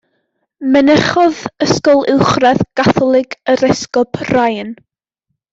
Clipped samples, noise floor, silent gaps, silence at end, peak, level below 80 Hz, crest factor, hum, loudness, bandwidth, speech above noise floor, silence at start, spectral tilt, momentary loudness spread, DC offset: under 0.1%; -73 dBFS; none; 0.8 s; 0 dBFS; -46 dBFS; 14 dB; none; -13 LUFS; 7.8 kHz; 61 dB; 0.6 s; -5.5 dB/octave; 7 LU; under 0.1%